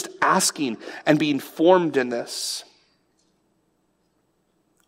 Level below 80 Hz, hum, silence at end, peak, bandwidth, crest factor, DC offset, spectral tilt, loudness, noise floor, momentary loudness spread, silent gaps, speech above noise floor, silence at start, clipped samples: -76 dBFS; none; 2.25 s; -4 dBFS; 16 kHz; 20 dB; under 0.1%; -3.5 dB/octave; -22 LUFS; -68 dBFS; 11 LU; none; 47 dB; 0 s; under 0.1%